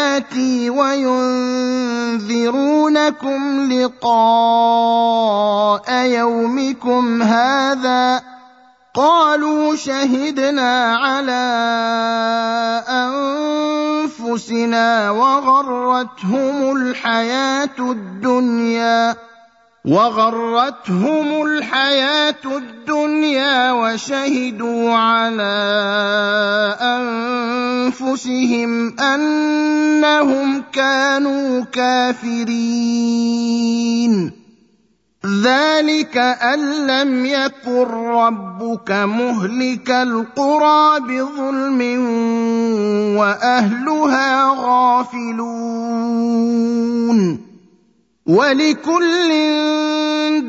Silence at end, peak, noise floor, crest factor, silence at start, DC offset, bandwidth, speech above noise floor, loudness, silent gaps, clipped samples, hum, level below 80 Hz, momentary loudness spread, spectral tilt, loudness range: 0 s; 0 dBFS; -59 dBFS; 16 dB; 0 s; under 0.1%; 7.8 kHz; 44 dB; -16 LUFS; none; under 0.1%; none; -68 dBFS; 6 LU; -4.5 dB/octave; 3 LU